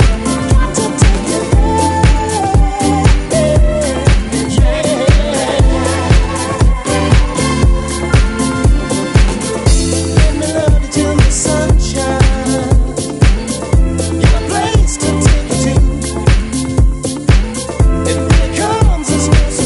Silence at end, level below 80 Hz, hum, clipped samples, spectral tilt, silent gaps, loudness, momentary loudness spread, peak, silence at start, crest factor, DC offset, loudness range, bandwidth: 0 s; -14 dBFS; none; under 0.1%; -5.5 dB/octave; none; -13 LUFS; 3 LU; 0 dBFS; 0 s; 10 dB; under 0.1%; 1 LU; 11.5 kHz